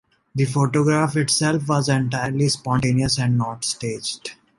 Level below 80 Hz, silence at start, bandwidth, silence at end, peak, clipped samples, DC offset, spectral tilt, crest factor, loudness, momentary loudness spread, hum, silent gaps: -50 dBFS; 0.35 s; 11.5 kHz; 0.25 s; -4 dBFS; under 0.1%; under 0.1%; -5 dB/octave; 16 dB; -21 LUFS; 8 LU; none; none